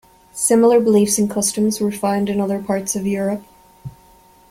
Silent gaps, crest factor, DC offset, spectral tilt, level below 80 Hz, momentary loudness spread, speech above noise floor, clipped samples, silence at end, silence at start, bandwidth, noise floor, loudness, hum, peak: none; 16 dB; under 0.1%; -4.5 dB/octave; -54 dBFS; 23 LU; 33 dB; under 0.1%; 0.6 s; 0.35 s; 16 kHz; -49 dBFS; -17 LUFS; none; -2 dBFS